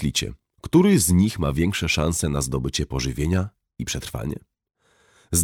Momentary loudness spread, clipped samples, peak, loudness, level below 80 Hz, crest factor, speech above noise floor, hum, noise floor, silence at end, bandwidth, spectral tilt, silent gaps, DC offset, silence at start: 16 LU; under 0.1%; -6 dBFS; -22 LUFS; -36 dBFS; 18 dB; 38 dB; none; -59 dBFS; 0 s; 19.5 kHz; -4.5 dB/octave; none; under 0.1%; 0 s